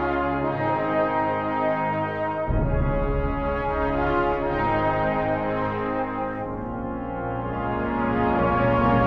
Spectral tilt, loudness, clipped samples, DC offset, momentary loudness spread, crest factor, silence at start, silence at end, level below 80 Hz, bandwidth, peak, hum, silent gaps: -9.5 dB/octave; -24 LUFS; under 0.1%; 0.3%; 7 LU; 14 dB; 0 s; 0 s; -34 dBFS; 6 kHz; -8 dBFS; none; none